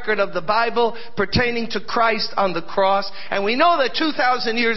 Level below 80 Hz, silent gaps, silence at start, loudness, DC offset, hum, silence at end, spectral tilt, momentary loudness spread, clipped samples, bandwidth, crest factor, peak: -48 dBFS; none; 0 s; -20 LUFS; 5%; none; 0 s; -5.5 dB/octave; 6 LU; under 0.1%; 6 kHz; 16 dB; -4 dBFS